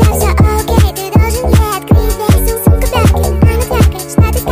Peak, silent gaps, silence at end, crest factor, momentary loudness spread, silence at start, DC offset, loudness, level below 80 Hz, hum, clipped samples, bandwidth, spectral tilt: 0 dBFS; none; 0 s; 10 dB; 2 LU; 0 s; under 0.1%; -11 LUFS; -14 dBFS; none; under 0.1%; 16 kHz; -6 dB/octave